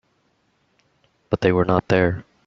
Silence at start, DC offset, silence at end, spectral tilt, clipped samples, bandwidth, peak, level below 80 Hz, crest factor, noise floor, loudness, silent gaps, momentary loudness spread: 1.3 s; under 0.1%; 0.25 s; -6 dB/octave; under 0.1%; 7.2 kHz; -2 dBFS; -50 dBFS; 20 dB; -66 dBFS; -20 LUFS; none; 5 LU